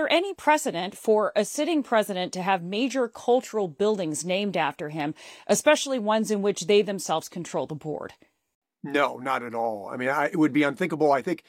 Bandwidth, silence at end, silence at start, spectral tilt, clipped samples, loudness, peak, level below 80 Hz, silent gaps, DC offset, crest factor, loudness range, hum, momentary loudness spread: 16.5 kHz; 0.1 s; 0 s; -4 dB/octave; under 0.1%; -25 LUFS; -8 dBFS; -74 dBFS; 8.55-8.62 s; under 0.1%; 18 dB; 3 LU; none; 9 LU